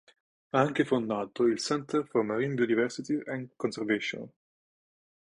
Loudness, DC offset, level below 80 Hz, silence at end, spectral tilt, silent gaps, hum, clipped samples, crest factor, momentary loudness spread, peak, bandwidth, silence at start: -30 LUFS; under 0.1%; -70 dBFS; 0.95 s; -5.5 dB/octave; none; none; under 0.1%; 22 dB; 8 LU; -10 dBFS; 11 kHz; 0.55 s